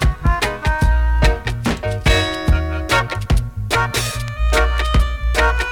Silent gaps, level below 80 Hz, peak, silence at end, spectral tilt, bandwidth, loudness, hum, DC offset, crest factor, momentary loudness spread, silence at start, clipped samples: none; -18 dBFS; -2 dBFS; 0 s; -4.5 dB/octave; 17.5 kHz; -18 LUFS; none; under 0.1%; 14 dB; 4 LU; 0 s; under 0.1%